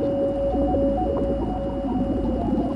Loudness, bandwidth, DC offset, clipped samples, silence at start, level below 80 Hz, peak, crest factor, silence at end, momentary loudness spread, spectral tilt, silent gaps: -24 LUFS; 9.6 kHz; under 0.1%; under 0.1%; 0 s; -32 dBFS; -12 dBFS; 12 dB; 0 s; 4 LU; -10 dB/octave; none